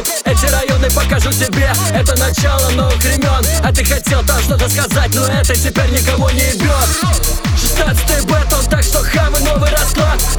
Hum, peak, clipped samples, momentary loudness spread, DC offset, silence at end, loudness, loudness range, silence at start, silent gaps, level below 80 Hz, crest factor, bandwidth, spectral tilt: none; 0 dBFS; under 0.1%; 1 LU; under 0.1%; 0 s; -13 LUFS; 0 LU; 0 s; none; -16 dBFS; 12 dB; over 20 kHz; -4 dB/octave